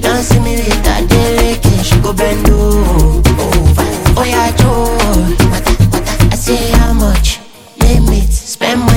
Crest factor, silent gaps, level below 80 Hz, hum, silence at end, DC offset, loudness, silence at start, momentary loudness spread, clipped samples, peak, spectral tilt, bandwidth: 10 dB; none; -14 dBFS; none; 0 s; under 0.1%; -11 LUFS; 0 s; 3 LU; 0.2%; 0 dBFS; -5 dB/octave; 17 kHz